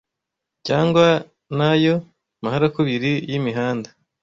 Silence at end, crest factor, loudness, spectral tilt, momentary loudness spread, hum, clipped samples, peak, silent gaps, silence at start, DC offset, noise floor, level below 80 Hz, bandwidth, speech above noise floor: 0.35 s; 18 dB; -20 LUFS; -7 dB/octave; 13 LU; none; under 0.1%; -2 dBFS; none; 0.65 s; under 0.1%; -82 dBFS; -56 dBFS; 7.6 kHz; 64 dB